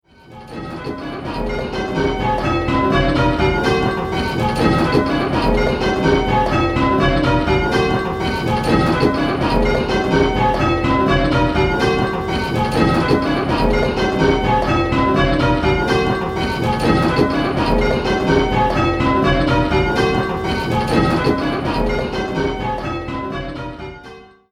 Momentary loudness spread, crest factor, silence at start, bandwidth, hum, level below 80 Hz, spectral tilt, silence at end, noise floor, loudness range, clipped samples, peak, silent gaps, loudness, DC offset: 8 LU; 16 dB; 0.3 s; 14.5 kHz; none; -28 dBFS; -6.5 dB/octave; 0.25 s; -40 dBFS; 3 LU; under 0.1%; 0 dBFS; none; -17 LUFS; under 0.1%